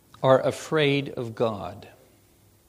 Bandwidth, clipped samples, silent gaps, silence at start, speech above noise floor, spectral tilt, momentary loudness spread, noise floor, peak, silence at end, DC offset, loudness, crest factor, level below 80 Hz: 15.5 kHz; under 0.1%; none; 0.2 s; 35 dB; -6 dB/octave; 14 LU; -59 dBFS; -4 dBFS; 0.8 s; under 0.1%; -24 LUFS; 22 dB; -62 dBFS